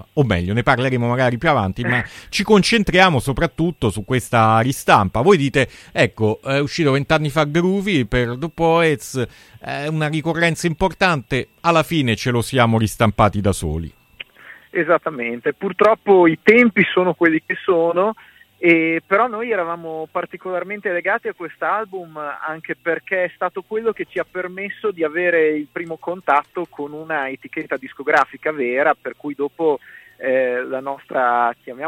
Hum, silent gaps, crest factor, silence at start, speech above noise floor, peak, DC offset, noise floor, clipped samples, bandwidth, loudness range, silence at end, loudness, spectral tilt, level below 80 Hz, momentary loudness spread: none; none; 18 dB; 0.15 s; 26 dB; 0 dBFS; under 0.1%; -44 dBFS; under 0.1%; 16.5 kHz; 7 LU; 0 s; -18 LUFS; -5.5 dB/octave; -42 dBFS; 12 LU